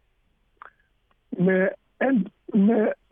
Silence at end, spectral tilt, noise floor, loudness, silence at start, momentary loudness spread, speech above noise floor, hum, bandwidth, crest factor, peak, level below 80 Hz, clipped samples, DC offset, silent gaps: 0.2 s; -12 dB/octave; -67 dBFS; -23 LUFS; 1.3 s; 7 LU; 45 dB; none; 3.6 kHz; 14 dB; -10 dBFS; -68 dBFS; under 0.1%; under 0.1%; none